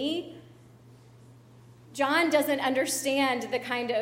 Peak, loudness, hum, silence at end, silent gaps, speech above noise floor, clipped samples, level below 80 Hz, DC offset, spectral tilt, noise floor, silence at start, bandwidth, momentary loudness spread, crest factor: -12 dBFS; -27 LUFS; none; 0 s; none; 27 dB; under 0.1%; -70 dBFS; under 0.1%; -2.5 dB/octave; -53 dBFS; 0 s; 16.5 kHz; 10 LU; 18 dB